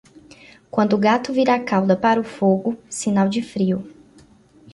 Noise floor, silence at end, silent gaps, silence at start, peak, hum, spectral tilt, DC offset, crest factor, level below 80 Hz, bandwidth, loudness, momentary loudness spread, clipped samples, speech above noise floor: -51 dBFS; 0.8 s; none; 0.75 s; -4 dBFS; none; -6 dB/octave; under 0.1%; 16 dB; -60 dBFS; 11.5 kHz; -20 LUFS; 7 LU; under 0.1%; 32 dB